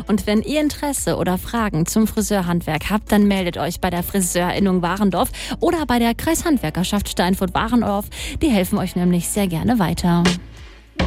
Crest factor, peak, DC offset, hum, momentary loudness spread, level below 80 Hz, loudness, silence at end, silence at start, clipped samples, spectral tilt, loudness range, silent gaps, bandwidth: 16 dB; -4 dBFS; under 0.1%; none; 4 LU; -34 dBFS; -19 LUFS; 0 s; 0 s; under 0.1%; -5 dB/octave; 1 LU; none; 16.5 kHz